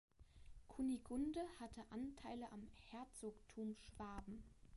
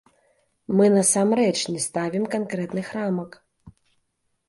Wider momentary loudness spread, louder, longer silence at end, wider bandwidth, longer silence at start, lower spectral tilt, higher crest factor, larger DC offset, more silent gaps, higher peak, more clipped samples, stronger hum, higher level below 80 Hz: first, 14 LU vs 11 LU; second, -51 LUFS vs -22 LUFS; second, 0 s vs 0.8 s; about the same, 11.5 kHz vs 11.5 kHz; second, 0.2 s vs 0.7 s; about the same, -5.5 dB/octave vs -4.5 dB/octave; about the same, 16 dB vs 18 dB; neither; neither; second, -36 dBFS vs -6 dBFS; neither; neither; about the same, -66 dBFS vs -64 dBFS